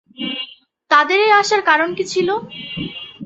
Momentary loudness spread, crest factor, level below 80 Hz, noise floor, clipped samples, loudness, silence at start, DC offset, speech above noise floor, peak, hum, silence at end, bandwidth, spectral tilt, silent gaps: 15 LU; 16 dB; -56 dBFS; -38 dBFS; under 0.1%; -16 LUFS; 0.2 s; under 0.1%; 21 dB; -2 dBFS; none; 0 s; 8.2 kHz; -3 dB/octave; none